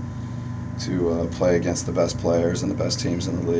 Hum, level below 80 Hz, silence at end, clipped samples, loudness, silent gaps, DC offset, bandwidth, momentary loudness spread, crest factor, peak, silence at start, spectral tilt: none; -40 dBFS; 0 s; under 0.1%; -24 LUFS; none; under 0.1%; 8 kHz; 10 LU; 14 dB; -8 dBFS; 0 s; -5.5 dB/octave